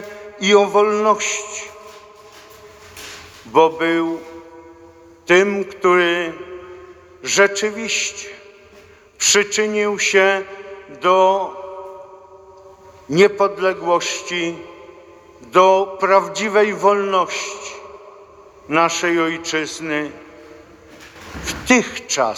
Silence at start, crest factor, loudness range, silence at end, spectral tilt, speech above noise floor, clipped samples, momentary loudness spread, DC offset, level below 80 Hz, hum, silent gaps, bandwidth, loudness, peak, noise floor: 0 s; 18 dB; 5 LU; 0 s; -2.5 dB/octave; 29 dB; under 0.1%; 21 LU; under 0.1%; -54 dBFS; none; none; 15 kHz; -17 LUFS; 0 dBFS; -46 dBFS